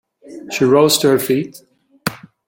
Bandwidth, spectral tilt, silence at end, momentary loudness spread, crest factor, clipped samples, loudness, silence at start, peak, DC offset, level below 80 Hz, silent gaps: 17 kHz; -4 dB/octave; 0.3 s; 16 LU; 18 dB; under 0.1%; -16 LUFS; 0.25 s; 0 dBFS; under 0.1%; -58 dBFS; none